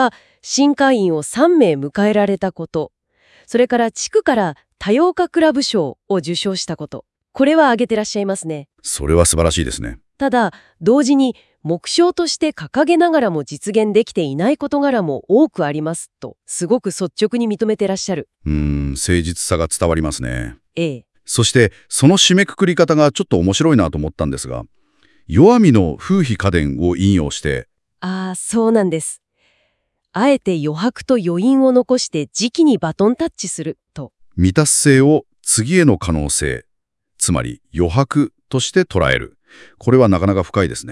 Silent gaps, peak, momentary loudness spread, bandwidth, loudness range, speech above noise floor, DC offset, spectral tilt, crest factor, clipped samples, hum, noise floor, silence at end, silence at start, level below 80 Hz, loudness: none; 0 dBFS; 12 LU; 12 kHz; 4 LU; 54 dB; under 0.1%; -5 dB/octave; 16 dB; under 0.1%; none; -70 dBFS; 0 s; 0 s; -38 dBFS; -16 LUFS